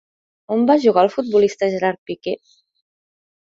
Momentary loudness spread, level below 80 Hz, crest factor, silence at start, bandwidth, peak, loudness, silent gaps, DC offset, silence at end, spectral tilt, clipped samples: 13 LU; -66 dBFS; 18 dB; 0.5 s; 7.6 kHz; -2 dBFS; -18 LUFS; 1.98-2.06 s; under 0.1%; 1.25 s; -6 dB/octave; under 0.1%